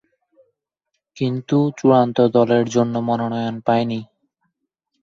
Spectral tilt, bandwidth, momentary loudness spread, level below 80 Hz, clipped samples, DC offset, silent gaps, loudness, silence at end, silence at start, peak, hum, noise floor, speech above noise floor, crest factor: -7 dB/octave; 7.4 kHz; 9 LU; -62 dBFS; under 0.1%; under 0.1%; none; -18 LUFS; 1 s; 1.15 s; -2 dBFS; none; -77 dBFS; 60 dB; 18 dB